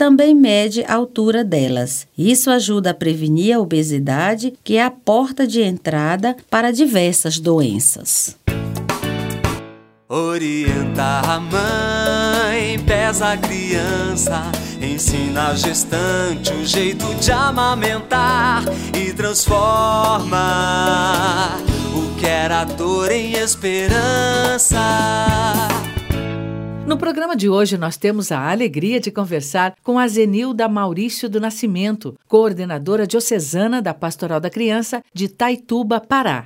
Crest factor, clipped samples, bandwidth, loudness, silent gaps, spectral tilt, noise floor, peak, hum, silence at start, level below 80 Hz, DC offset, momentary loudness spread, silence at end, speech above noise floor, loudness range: 16 dB; under 0.1%; 16.5 kHz; -17 LUFS; none; -4 dB/octave; -39 dBFS; 0 dBFS; none; 0 s; -34 dBFS; under 0.1%; 7 LU; 0 s; 22 dB; 3 LU